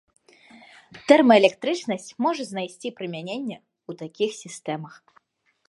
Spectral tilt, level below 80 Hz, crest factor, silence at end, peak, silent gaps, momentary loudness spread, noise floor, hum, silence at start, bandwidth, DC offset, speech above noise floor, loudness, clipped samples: -4.5 dB/octave; -74 dBFS; 24 dB; 0.8 s; 0 dBFS; none; 21 LU; -70 dBFS; none; 0.95 s; 11.5 kHz; under 0.1%; 47 dB; -23 LUFS; under 0.1%